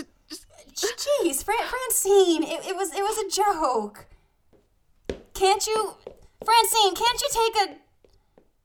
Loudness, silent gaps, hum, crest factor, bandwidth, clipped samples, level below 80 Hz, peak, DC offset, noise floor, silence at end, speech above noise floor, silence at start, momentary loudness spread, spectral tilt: -23 LUFS; none; none; 18 dB; over 20 kHz; under 0.1%; -54 dBFS; -8 dBFS; under 0.1%; -62 dBFS; 0.9 s; 39 dB; 0 s; 19 LU; -1 dB/octave